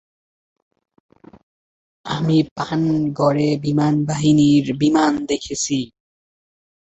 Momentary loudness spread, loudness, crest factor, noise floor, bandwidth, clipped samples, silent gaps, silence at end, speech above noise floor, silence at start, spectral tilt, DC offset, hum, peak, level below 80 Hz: 9 LU; -18 LUFS; 16 dB; under -90 dBFS; 8.2 kHz; under 0.1%; 2.51-2.56 s; 1 s; over 73 dB; 2.05 s; -6 dB/octave; under 0.1%; none; -4 dBFS; -54 dBFS